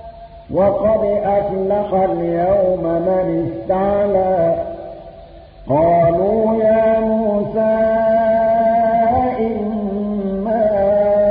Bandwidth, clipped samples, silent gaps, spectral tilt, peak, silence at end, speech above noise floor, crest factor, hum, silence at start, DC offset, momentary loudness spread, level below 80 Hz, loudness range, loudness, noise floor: 4.8 kHz; under 0.1%; none; -13 dB/octave; -4 dBFS; 0 s; 23 dB; 12 dB; none; 0 s; under 0.1%; 7 LU; -40 dBFS; 3 LU; -16 LUFS; -38 dBFS